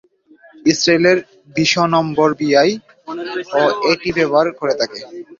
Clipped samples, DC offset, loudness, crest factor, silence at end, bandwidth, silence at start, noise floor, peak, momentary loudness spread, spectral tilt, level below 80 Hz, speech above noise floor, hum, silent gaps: under 0.1%; under 0.1%; -16 LUFS; 16 dB; 0.05 s; 7.6 kHz; 0.65 s; -48 dBFS; -2 dBFS; 12 LU; -4.5 dB/octave; -54 dBFS; 33 dB; none; none